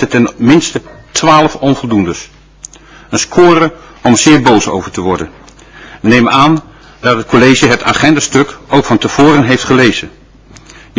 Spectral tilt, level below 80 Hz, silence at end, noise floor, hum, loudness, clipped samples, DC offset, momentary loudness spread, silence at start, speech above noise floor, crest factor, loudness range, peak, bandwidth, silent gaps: -4.5 dB/octave; -38 dBFS; 0.9 s; -38 dBFS; none; -9 LUFS; 2%; under 0.1%; 11 LU; 0 s; 29 dB; 10 dB; 3 LU; 0 dBFS; 8 kHz; none